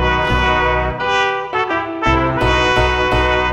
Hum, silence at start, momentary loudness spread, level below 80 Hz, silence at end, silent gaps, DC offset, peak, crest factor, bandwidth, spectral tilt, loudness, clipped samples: none; 0 s; 4 LU; -24 dBFS; 0 s; none; under 0.1%; -2 dBFS; 14 dB; 11 kHz; -5 dB/octave; -15 LUFS; under 0.1%